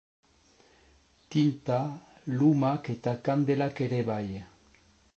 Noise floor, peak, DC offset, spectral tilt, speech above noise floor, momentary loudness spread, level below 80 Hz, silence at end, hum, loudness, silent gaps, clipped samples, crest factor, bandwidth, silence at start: -62 dBFS; -12 dBFS; under 0.1%; -8.5 dB/octave; 35 dB; 12 LU; -64 dBFS; 0.7 s; none; -29 LUFS; none; under 0.1%; 18 dB; 7.8 kHz; 1.3 s